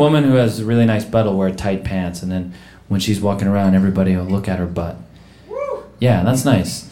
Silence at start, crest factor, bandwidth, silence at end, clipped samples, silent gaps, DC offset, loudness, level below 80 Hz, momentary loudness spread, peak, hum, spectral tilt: 0 s; 16 dB; 16.5 kHz; 0 s; under 0.1%; none; 0.5%; -18 LUFS; -42 dBFS; 11 LU; -2 dBFS; none; -6.5 dB/octave